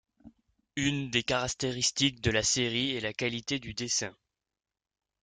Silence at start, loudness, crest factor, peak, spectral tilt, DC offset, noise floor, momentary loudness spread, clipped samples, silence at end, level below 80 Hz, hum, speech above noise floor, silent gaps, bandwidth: 0.25 s; -29 LUFS; 22 dB; -10 dBFS; -3 dB/octave; under 0.1%; -59 dBFS; 7 LU; under 0.1%; 1.1 s; -56 dBFS; none; 28 dB; none; 10.5 kHz